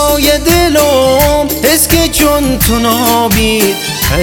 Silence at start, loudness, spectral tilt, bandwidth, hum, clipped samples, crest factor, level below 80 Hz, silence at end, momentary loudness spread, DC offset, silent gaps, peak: 0 s; -9 LUFS; -3.5 dB/octave; over 20 kHz; none; 0.1%; 10 dB; -22 dBFS; 0 s; 3 LU; under 0.1%; none; 0 dBFS